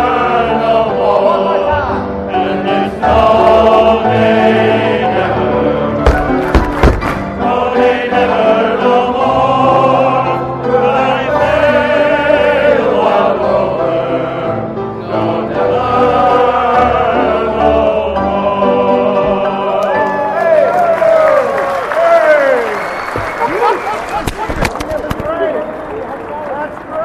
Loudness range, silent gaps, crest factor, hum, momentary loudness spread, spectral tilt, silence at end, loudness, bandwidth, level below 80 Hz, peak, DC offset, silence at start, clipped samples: 3 LU; none; 12 dB; none; 9 LU; -6.5 dB/octave; 0 s; -12 LUFS; 13.5 kHz; -28 dBFS; 0 dBFS; under 0.1%; 0 s; under 0.1%